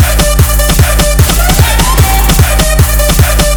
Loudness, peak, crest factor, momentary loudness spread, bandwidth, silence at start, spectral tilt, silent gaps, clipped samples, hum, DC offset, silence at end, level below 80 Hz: -8 LUFS; 0 dBFS; 6 dB; 1 LU; over 20 kHz; 0 s; -4 dB/octave; none; 2%; none; under 0.1%; 0 s; -10 dBFS